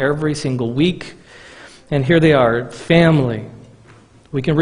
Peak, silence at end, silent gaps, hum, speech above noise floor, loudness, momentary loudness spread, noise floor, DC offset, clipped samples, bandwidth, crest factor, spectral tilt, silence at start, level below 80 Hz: 0 dBFS; 0 s; none; none; 31 dB; -16 LUFS; 16 LU; -46 dBFS; under 0.1%; under 0.1%; 10.5 kHz; 18 dB; -7 dB/octave; 0 s; -44 dBFS